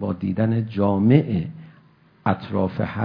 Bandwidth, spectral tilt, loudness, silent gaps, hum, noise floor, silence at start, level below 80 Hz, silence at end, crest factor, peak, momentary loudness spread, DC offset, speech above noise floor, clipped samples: 5.2 kHz; -11.5 dB/octave; -22 LUFS; none; none; -54 dBFS; 0 s; -54 dBFS; 0 s; 20 dB; -2 dBFS; 9 LU; under 0.1%; 33 dB; under 0.1%